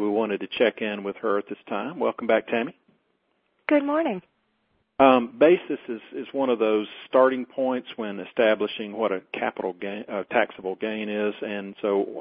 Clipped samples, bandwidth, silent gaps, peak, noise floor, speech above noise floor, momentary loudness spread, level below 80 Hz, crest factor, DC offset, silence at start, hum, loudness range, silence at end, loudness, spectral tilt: under 0.1%; 5 kHz; none; -2 dBFS; -71 dBFS; 47 dB; 13 LU; -70 dBFS; 22 dB; under 0.1%; 0 s; none; 5 LU; 0 s; -25 LUFS; -9.5 dB/octave